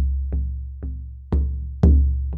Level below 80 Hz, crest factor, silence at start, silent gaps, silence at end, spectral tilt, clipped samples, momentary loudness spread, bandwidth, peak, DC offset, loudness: -22 dBFS; 18 dB; 0 s; none; 0 s; -11.5 dB/octave; under 0.1%; 16 LU; 2 kHz; -2 dBFS; under 0.1%; -22 LUFS